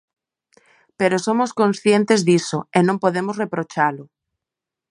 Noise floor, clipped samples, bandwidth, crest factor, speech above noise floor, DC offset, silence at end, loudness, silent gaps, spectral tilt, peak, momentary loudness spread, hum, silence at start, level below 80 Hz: -86 dBFS; under 0.1%; 11 kHz; 18 dB; 68 dB; under 0.1%; 0.85 s; -19 LUFS; none; -5.5 dB/octave; -2 dBFS; 8 LU; none; 1 s; -68 dBFS